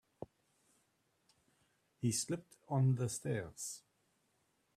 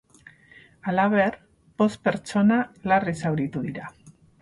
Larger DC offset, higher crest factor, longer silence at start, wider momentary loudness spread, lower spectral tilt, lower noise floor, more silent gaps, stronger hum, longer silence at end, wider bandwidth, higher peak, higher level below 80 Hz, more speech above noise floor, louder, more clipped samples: neither; about the same, 18 dB vs 16 dB; second, 0.2 s vs 0.85 s; first, 20 LU vs 12 LU; second, -5.5 dB/octave vs -7 dB/octave; first, -79 dBFS vs -53 dBFS; neither; neither; first, 0.95 s vs 0.3 s; first, 14.5 kHz vs 11.5 kHz; second, -24 dBFS vs -10 dBFS; second, -74 dBFS vs -60 dBFS; first, 42 dB vs 30 dB; second, -38 LUFS vs -24 LUFS; neither